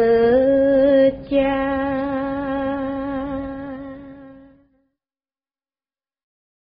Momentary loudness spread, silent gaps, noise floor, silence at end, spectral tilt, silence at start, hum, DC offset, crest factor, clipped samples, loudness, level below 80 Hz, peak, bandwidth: 17 LU; none; under -90 dBFS; 2.35 s; -5 dB/octave; 0 s; none; under 0.1%; 14 dB; under 0.1%; -19 LUFS; -46 dBFS; -6 dBFS; 5.2 kHz